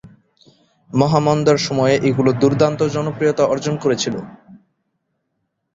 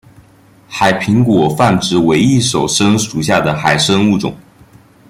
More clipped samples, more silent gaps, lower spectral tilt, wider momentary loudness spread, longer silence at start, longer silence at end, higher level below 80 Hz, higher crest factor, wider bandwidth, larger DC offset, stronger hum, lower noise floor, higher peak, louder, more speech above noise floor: neither; neither; first, -6 dB/octave vs -4.5 dB/octave; first, 7 LU vs 4 LU; second, 0.05 s vs 0.7 s; first, 1.2 s vs 0.75 s; second, -52 dBFS vs -44 dBFS; first, 18 dB vs 12 dB; second, 8 kHz vs 16 kHz; neither; neither; first, -73 dBFS vs -45 dBFS; about the same, -2 dBFS vs 0 dBFS; second, -17 LUFS vs -12 LUFS; first, 56 dB vs 33 dB